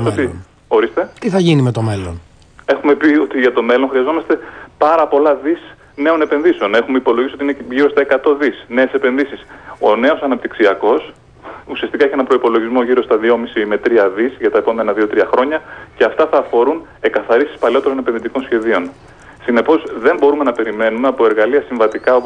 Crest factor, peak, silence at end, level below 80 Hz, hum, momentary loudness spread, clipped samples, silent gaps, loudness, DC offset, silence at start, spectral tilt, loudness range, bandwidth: 12 dB; -2 dBFS; 0 s; -50 dBFS; none; 9 LU; under 0.1%; none; -14 LUFS; under 0.1%; 0 s; -7 dB/octave; 2 LU; 9.8 kHz